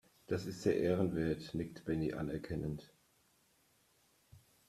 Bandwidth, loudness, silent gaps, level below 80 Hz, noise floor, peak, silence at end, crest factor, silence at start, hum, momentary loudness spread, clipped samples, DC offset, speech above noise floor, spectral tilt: 14.5 kHz; -38 LUFS; none; -62 dBFS; -73 dBFS; -18 dBFS; 0.3 s; 20 dB; 0.3 s; none; 9 LU; under 0.1%; under 0.1%; 36 dB; -7 dB/octave